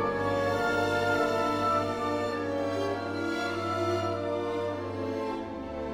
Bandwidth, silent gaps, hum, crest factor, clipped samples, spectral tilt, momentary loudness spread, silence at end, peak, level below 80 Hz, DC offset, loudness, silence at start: 19 kHz; none; none; 14 dB; under 0.1%; -5.5 dB/octave; 7 LU; 0 s; -16 dBFS; -56 dBFS; under 0.1%; -30 LUFS; 0 s